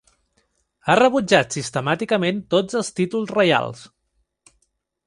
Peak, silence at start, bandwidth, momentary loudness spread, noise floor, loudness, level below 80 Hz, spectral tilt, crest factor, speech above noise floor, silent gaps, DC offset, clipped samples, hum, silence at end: -2 dBFS; 0.85 s; 11.5 kHz; 9 LU; -70 dBFS; -20 LUFS; -60 dBFS; -4.5 dB/octave; 20 dB; 51 dB; none; under 0.1%; under 0.1%; none; 1.2 s